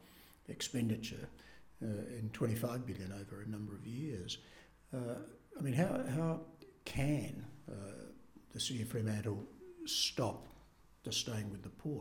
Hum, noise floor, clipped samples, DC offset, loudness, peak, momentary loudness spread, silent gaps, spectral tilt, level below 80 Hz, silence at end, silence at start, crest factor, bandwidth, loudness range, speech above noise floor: none; -64 dBFS; under 0.1%; under 0.1%; -41 LUFS; -20 dBFS; 17 LU; none; -5 dB/octave; -62 dBFS; 0 s; 0 s; 20 dB; 17.5 kHz; 3 LU; 24 dB